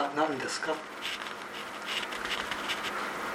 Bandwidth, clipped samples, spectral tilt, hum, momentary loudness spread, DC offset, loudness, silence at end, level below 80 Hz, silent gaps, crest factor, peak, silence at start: 17 kHz; under 0.1%; -2 dB/octave; none; 7 LU; under 0.1%; -33 LUFS; 0 s; -66 dBFS; none; 18 dB; -16 dBFS; 0 s